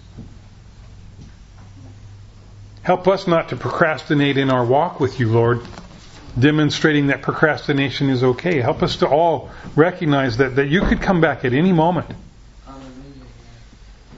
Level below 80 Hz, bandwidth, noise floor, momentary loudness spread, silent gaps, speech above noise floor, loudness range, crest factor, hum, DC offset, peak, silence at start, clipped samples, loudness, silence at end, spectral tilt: -38 dBFS; 8 kHz; -43 dBFS; 10 LU; none; 26 dB; 5 LU; 20 dB; none; under 0.1%; 0 dBFS; 0.15 s; under 0.1%; -18 LUFS; 0 s; -7 dB/octave